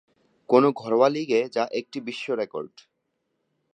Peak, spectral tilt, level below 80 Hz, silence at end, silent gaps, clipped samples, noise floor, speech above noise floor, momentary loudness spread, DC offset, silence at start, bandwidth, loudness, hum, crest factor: -4 dBFS; -6 dB/octave; -80 dBFS; 1.05 s; none; under 0.1%; -76 dBFS; 53 dB; 13 LU; under 0.1%; 0.5 s; 9.4 kHz; -24 LUFS; none; 22 dB